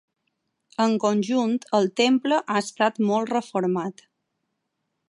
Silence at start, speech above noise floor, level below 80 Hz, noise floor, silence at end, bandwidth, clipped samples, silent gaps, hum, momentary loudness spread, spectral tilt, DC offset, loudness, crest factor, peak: 0.8 s; 56 dB; -76 dBFS; -78 dBFS; 1.2 s; 11.5 kHz; under 0.1%; none; none; 6 LU; -5 dB/octave; under 0.1%; -23 LUFS; 18 dB; -6 dBFS